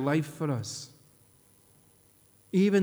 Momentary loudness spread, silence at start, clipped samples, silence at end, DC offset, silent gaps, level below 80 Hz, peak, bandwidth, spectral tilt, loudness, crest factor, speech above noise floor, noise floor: 15 LU; 0 s; under 0.1%; 0 s; under 0.1%; none; -74 dBFS; -14 dBFS; over 20 kHz; -6.5 dB/octave; -30 LUFS; 16 dB; 35 dB; -62 dBFS